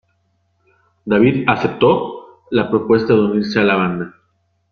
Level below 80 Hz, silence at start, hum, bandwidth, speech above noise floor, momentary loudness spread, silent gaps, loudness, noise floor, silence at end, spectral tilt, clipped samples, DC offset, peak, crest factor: -52 dBFS; 1.05 s; none; 6.6 kHz; 49 dB; 14 LU; none; -16 LUFS; -64 dBFS; 0.65 s; -8 dB/octave; under 0.1%; under 0.1%; -2 dBFS; 16 dB